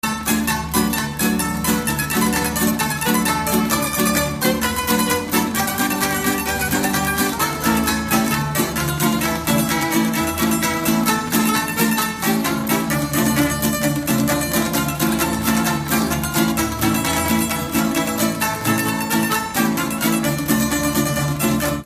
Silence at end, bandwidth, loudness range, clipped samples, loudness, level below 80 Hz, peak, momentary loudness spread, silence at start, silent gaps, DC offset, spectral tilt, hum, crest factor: 0 s; 15.5 kHz; 1 LU; under 0.1%; -19 LUFS; -38 dBFS; -2 dBFS; 2 LU; 0.05 s; none; under 0.1%; -3.5 dB/octave; none; 18 dB